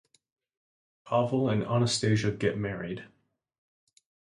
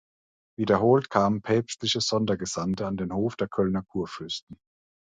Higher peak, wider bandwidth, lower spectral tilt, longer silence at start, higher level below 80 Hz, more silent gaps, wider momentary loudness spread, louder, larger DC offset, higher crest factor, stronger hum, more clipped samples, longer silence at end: second, -14 dBFS vs -6 dBFS; first, 11.5 kHz vs 9.4 kHz; about the same, -5.5 dB/octave vs -5 dB/octave; first, 1.05 s vs 0.6 s; about the same, -60 dBFS vs -56 dBFS; second, none vs 4.42-4.47 s; about the same, 11 LU vs 12 LU; about the same, -28 LUFS vs -26 LUFS; neither; about the same, 18 dB vs 20 dB; neither; neither; first, 1.3 s vs 0.55 s